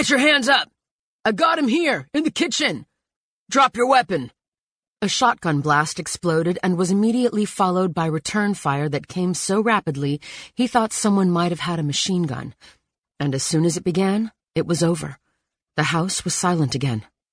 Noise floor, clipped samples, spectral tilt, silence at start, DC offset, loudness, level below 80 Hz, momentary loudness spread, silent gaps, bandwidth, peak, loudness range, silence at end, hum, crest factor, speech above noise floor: under -90 dBFS; under 0.1%; -4.5 dB/octave; 0 s; under 0.1%; -20 LUFS; -58 dBFS; 9 LU; 0.91-1.19 s, 3.16-3.46 s, 4.48-4.52 s, 4.59-4.93 s, 12.99-13.03 s; 10.5 kHz; -4 dBFS; 3 LU; 0.3 s; none; 18 dB; over 70 dB